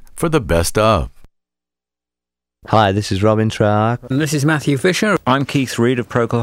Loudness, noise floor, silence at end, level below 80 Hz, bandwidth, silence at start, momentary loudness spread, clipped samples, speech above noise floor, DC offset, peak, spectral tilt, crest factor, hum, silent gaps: -16 LUFS; -88 dBFS; 0 s; -36 dBFS; 16 kHz; 0 s; 4 LU; under 0.1%; 73 dB; under 0.1%; 0 dBFS; -5.5 dB/octave; 16 dB; 60 Hz at -45 dBFS; none